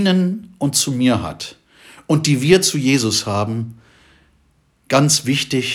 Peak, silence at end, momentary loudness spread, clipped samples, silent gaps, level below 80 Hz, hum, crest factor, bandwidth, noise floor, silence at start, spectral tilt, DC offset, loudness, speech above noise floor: -2 dBFS; 0 s; 13 LU; under 0.1%; none; -54 dBFS; none; 18 dB; 18 kHz; -59 dBFS; 0 s; -4 dB/octave; under 0.1%; -17 LUFS; 42 dB